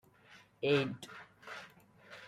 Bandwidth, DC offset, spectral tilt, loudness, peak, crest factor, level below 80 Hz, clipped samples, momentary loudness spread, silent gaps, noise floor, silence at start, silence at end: 14 kHz; under 0.1%; -6 dB/octave; -35 LUFS; -20 dBFS; 20 dB; -78 dBFS; under 0.1%; 22 LU; none; -62 dBFS; 0.3 s; 0 s